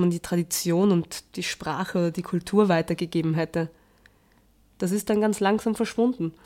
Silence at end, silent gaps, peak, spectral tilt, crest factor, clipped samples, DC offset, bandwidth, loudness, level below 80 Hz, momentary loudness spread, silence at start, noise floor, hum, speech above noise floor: 0.15 s; none; -8 dBFS; -5.5 dB/octave; 16 dB; under 0.1%; under 0.1%; 16.5 kHz; -25 LUFS; -58 dBFS; 9 LU; 0 s; -60 dBFS; none; 36 dB